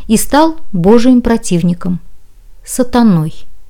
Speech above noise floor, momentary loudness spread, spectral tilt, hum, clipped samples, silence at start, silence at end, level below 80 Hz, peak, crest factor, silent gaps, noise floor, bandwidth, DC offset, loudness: 22 dB; 12 LU; -6 dB/octave; none; under 0.1%; 0 s; 0 s; -32 dBFS; 0 dBFS; 10 dB; none; -31 dBFS; 18.5 kHz; under 0.1%; -11 LUFS